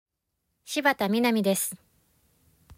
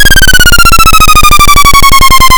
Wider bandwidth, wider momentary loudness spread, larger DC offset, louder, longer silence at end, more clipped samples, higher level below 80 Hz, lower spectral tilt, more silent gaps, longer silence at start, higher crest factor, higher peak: second, 16 kHz vs over 20 kHz; first, 9 LU vs 0 LU; second, under 0.1% vs 10%; second, -25 LUFS vs -2 LUFS; first, 1.05 s vs 0 s; second, under 0.1% vs 60%; second, -68 dBFS vs -8 dBFS; first, -3.5 dB/octave vs -1.5 dB/octave; neither; first, 0.65 s vs 0 s; first, 20 dB vs 2 dB; second, -8 dBFS vs 0 dBFS